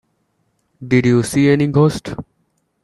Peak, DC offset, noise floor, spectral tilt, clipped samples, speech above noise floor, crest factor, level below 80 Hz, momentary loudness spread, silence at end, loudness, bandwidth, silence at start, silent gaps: 0 dBFS; under 0.1%; -66 dBFS; -7 dB/octave; under 0.1%; 51 dB; 18 dB; -48 dBFS; 17 LU; 0.6 s; -15 LUFS; 12.5 kHz; 0.8 s; none